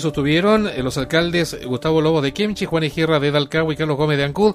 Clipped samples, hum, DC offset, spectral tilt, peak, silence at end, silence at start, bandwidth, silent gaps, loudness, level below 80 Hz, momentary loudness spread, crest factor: under 0.1%; none; under 0.1%; -6 dB/octave; -2 dBFS; 0 s; 0 s; 15.5 kHz; none; -19 LUFS; -42 dBFS; 5 LU; 16 dB